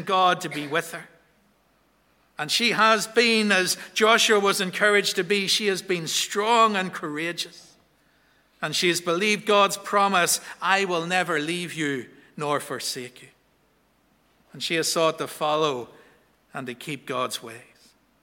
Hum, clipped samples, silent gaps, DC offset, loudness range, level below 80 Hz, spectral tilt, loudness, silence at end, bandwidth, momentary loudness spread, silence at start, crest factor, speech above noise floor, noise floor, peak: none; under 0.1%; none; under 0.1%; 8 LU; -72 dBFS; -2.5 dB/octave; -22 LUFS; 0.6 s; 17 kHz; 15 LU; 0 s; 20 dB; 41 dB; -64 dBFS; -4 dBFS